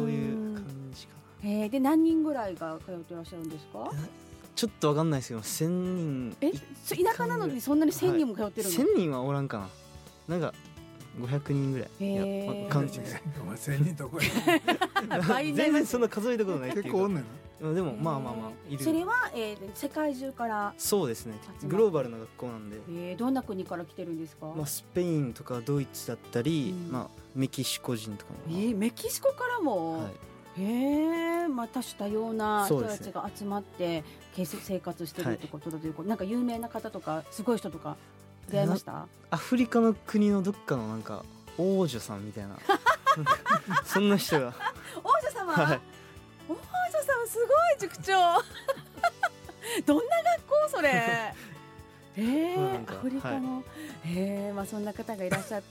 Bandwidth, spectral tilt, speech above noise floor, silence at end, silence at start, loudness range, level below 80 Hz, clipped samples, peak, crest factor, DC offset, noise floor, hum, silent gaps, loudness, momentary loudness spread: 17 kHz; -5.5 dB/octave; 21 dB; 0 s; 0 s; 6 LU; -62 dBFS; under 0.1%; -10 dBFS; 20 dB; under 0.1%; -51 dBFS; none; none; -30 LUFS; 15 LU